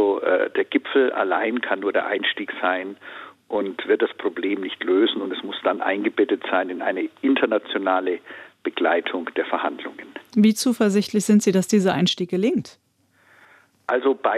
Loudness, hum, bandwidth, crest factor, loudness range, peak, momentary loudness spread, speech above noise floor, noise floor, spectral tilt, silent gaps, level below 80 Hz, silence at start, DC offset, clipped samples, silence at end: -22 LUFS; none; 14.5 kHz; 16 dB; 4 LU; -6 dBFS; 10 LU; 39 dB; -61 dBFS; -5 dB/octave; none; -72 dBFS; 0 s; under 0.1%; under 0.1%; 0 s